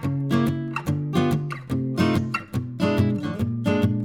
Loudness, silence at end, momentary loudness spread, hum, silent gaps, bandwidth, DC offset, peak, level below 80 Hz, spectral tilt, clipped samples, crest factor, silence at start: -24 LUFS; 0 s; 6 LU; none; none; 17 kHz; under 0.1%; -6 dBFS; -50 dBFS; -7.5 dB/octave; under 0.1%; 16 dB; 0 s